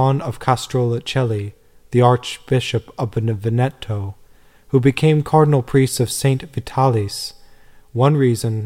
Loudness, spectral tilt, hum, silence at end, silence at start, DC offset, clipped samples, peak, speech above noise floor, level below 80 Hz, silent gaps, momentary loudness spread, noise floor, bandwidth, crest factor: -18 LUFS; -6.5 dB/octave; none; 0 s; 0 s; 0.2%; under 0.1%; -2 dBFS; 31 dB; -46 dBFS; none; 11 LU; -48 dBFS; 16 kHz; 16 dB